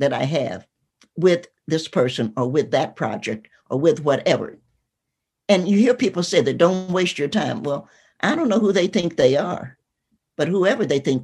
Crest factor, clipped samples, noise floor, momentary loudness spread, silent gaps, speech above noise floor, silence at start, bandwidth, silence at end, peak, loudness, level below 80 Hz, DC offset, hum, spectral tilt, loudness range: 18 dB; under 0.1%; -81 dBFS; 11 LU; none; 61 dB; 0 s; 11.5 kHz; 0 s; -2 dBFS; -20 LUFS; -62 dBFS; under 0.1%; none; -5.5 dB/octave; 3 LU